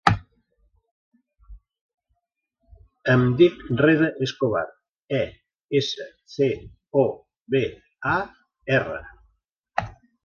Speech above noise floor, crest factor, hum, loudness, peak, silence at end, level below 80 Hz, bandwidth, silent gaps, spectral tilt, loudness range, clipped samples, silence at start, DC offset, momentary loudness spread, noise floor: 56 dB; 24 dB; none; -23 LUFS; 0 dBFS; 0.35 s; -50 dBFS; 10 kHz; 0.91-1.11 s, 1.81-1.98 s, 4.91-5.06 s, 5.64-5.69 s, 9.52-9.63 s; -7 dB/octave; 5 LU; under 0.1%; 0.05 s; under 0.1%; 16 LU; -78 dBFS